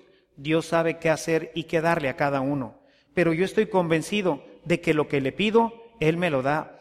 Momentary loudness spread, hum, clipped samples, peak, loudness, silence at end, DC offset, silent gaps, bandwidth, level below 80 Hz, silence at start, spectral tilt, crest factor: 6 LU; none; under 0.1%; -8 dBFS; -25 LUFS; 0.1 s; under 0.1%; none; 14.5 kHz; -56 dBFS; 0.4 s; -6 dB/octave; 16 dB